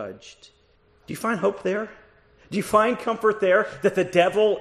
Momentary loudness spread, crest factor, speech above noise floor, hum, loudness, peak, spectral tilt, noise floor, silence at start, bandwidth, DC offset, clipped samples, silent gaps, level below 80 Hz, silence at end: 15 LU; 20 dB; 37 dB; none; -22 LUFS; -4 dBFS; -5 dB/octave; -60 dBFS; 0 s; 14 kHz; under 0.1%; under 0.1%; none; -60 dBFS; 0 s